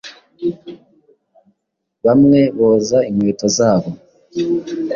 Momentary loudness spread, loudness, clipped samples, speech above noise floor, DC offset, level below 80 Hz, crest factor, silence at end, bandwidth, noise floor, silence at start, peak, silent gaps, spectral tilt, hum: 18 LU; -15 LUFS; under 0.1%; 61 dB; under 0.1%; -54 dBFS; 14 dB; 0 s; 7.4 kHz; -75 dBFS; 0.05 s; -2 dBFS; none; -6 dB/octave; none